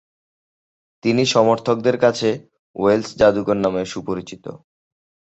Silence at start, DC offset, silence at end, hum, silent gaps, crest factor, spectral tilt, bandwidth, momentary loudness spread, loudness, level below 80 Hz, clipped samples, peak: 1.05 s; under 0.1%; 0.75 s; none; 2.59-2.74 s; 18 dB; -5 dB/octave; 8.2 kHz; 16 LU; -19 LUFS; -54 dBFS; under 0.1%; -2 dBFS